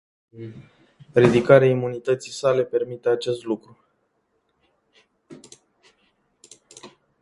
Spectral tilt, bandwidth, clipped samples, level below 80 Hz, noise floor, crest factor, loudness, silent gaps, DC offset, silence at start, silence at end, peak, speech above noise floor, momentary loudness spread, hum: -6.5 dB/octave; 11.5 kHz; under 0.1%; -60 dBFS; -70 dBFS; 24 dB; -20 LUFS; none; under 0.1%; 0.35 s; 0.35 s; 0 dBFS; 50 dB; 25 LU; none